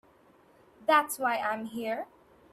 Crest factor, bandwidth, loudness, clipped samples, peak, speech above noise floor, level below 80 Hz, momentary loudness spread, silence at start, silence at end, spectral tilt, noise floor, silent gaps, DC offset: 22 dB; 15 kHz; -29 LUFS; under 0.1%; -10 dBFS; 32 dB; -76 dBFS; 11 LU; 0.8 s; 0.5 s; -2.5 dB/octave; -61 dBFS; none; under 0.1%